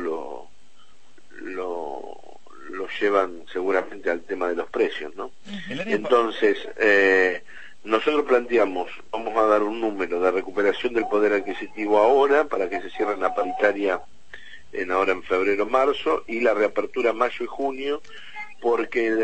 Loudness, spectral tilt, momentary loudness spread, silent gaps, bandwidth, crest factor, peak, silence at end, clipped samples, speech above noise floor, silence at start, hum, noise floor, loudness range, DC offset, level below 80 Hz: -23 LUFS; -5 dB/octave; 15 LU; none; 8.6 kHz; 20 dB; -4 dBFS; 0 s; under 0.1%; 36 dB; 0 s; none; -58 dBFS; 6 LU; 1%; -60 dBFS